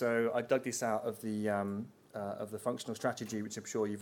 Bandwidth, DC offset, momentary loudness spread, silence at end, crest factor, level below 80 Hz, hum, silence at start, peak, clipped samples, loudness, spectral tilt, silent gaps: 19 kHz; under 0.1%; 9 LU; 0 s; 18 dB; -80 dBFS; none; 0 s; -18 dBFS; under 0.1%; -36 LUFS; -5 dB/octave; none